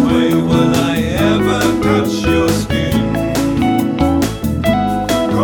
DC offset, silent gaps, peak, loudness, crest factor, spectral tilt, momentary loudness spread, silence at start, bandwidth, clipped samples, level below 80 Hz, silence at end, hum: under 0.1%; none; -2 dBFS; -14 LUFS; 12 dB; -6 dB/octave; 3 LU; 0 s; 20 kHz; under 0.1%; -30 dBFS; 0 s; none